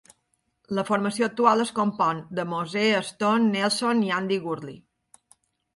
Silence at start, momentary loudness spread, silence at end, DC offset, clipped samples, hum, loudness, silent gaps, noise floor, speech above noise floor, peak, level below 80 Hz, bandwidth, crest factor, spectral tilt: 0.7 s; 9 LU; 1 s; under 0.1%; under 0.1%; none; -24 LUFS; none; -73 dBFS; 49 dB; -6 dBFS; -70 dBFS; 11.5 kHz; 20 dB; -4.5 dB/octave